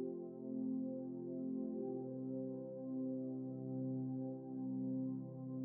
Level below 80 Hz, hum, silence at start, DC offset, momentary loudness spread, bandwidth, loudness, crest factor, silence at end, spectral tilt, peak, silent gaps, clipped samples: -88 dBFS; none; 0 s; under 0.1%; 4 LU; 1.5 kHz; -44 LUFS; 10 dB; 0 s; -13.5 dB/octave; -34 dBFS; none; under 0.1%